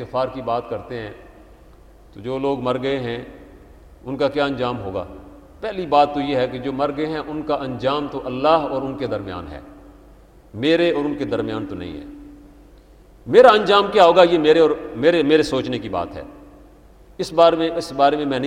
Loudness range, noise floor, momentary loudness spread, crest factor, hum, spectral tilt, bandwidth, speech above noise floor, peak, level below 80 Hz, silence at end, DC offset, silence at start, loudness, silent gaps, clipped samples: 11 LU; -47 dBFS; 19 LU; 20 dB; none; -6 dB/octave; 11 kHz; 28 dB; 0 dBFS; -48 dBFS; 0 s; under 0.1%; 0 s; -19 LUFS; none; under 0.1%